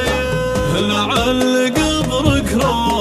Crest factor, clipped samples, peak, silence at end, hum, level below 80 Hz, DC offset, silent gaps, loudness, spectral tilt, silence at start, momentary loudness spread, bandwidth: 14 dB; under 0.1%; -2 dBFS; 0 s; none; -30 dBFS; under 0.1%; none; -16 LUFS; -4.5 dB/octave; 0 s; 3 LU; 15 kHz